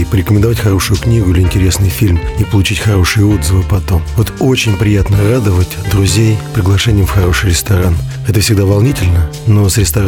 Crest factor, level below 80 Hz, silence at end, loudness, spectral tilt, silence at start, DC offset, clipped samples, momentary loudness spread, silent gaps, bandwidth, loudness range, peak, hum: 8 dB; -22 dBFS; 0 s; -11 LUFS; -5.5 dB/octave; 0 s; under 0.1%; under 0.1%; 4 LU; none; 18 kHz; 1 LU; -2 dBFS; none